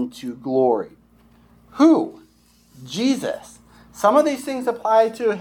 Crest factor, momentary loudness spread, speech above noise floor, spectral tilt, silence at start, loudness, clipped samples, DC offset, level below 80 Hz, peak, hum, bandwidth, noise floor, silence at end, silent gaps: 18 dB; 16 LU; 36 dB; -5 dB/octave; 0 s; -20 LUFS; under 0.1%; under 0.1%; -60 dBFS; -2 dBFS; none; 16 kHz; -55 dBFS; 0 s; none